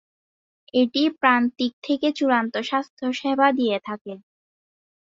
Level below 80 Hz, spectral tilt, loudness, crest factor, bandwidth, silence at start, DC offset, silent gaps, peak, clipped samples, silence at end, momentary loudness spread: -70 dBFS; -4.5 dB/octave; -22 LUFS; 20 dB; 7.6 kHz; 0.75 s; under 0.1%; 1.73-1.82 s, 2.90-2.97 s, 4.01-4.05 s; -2 dBFS; under 0.1%; 0.85 s; 11 LU